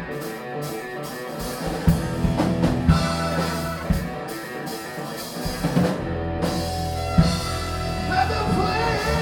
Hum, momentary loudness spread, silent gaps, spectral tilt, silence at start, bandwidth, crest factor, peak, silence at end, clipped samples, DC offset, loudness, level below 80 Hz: none; 11 LU; none; -6 dB/octave; 0 s; 18 kHz; 20 dB; -4 dBFS; 0 s; under 0.1%; under 0.1%; -24 LUFS; -34 dBFS